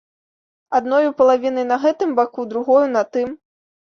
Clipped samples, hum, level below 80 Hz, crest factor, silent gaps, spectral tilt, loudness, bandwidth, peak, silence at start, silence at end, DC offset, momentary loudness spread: under 0.1%; none; -64 dBFS; 16 dB; none; -5 dB/octave; -18 LUFS; 7 kHz; -4 dBFS; 0.7 s; 0.65 s; under 0.1%; 8 LU